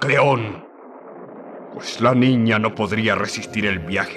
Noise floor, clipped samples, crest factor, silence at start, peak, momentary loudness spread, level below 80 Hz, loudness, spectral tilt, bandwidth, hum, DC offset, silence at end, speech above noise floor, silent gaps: -40 dBFS; under 0.1%; 16 dB; 0 s; -6 dBFS; 21 LU; -58 dBFS; -19 LUFS; -5.5 dB/octave; 12 kHz; none; under 0.1%; 0 s; 21 dB; none